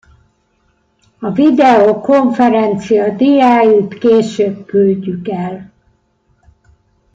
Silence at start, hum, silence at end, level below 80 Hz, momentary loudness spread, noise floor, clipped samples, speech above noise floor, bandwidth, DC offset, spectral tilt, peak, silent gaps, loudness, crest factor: 1.2 s; none; 1.5 s; -54 dBFS; 12 LU; -59 dBFS; under 0.1%; 48 dB; 7.8 kHz; under 0.1%; -7 dB/octave; -2 dBFS; none; -11 LUFS; 12 dB